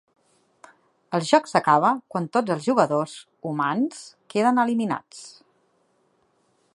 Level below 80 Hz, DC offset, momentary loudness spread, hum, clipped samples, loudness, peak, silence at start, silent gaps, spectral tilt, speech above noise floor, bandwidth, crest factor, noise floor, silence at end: -78 dBFS; under 0.1%; 15 LU; none; under 0.1%; -23 LUFS; -2 dBFS; 1.1 s; none; -5.5 dB/octave; 44 dB; 11.5 kHz; 22 dB; -66 dBFS; 1.45 s